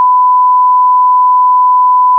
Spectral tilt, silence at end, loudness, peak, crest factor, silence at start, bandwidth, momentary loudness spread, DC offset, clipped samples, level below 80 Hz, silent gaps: -4 dB/octave; 0 s; -7 LUFS; -4 dBFS; 4 dB; 0 s; 1.1 kHz; 0 LU; under 0.1%; under 0.1%; under -90 dBFS; none